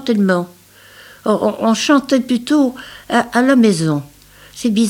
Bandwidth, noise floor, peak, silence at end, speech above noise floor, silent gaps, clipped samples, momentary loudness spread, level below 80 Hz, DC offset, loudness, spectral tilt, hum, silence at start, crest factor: 16.5 kHz; -43 dBFS; -2 dBFS; 0 s; 28 dB; none; under 0.1%; 10 LU; -54 dBFS; under 0.1%; -15 LUFS; -5 dB/octave; none; 0 s; 14 dB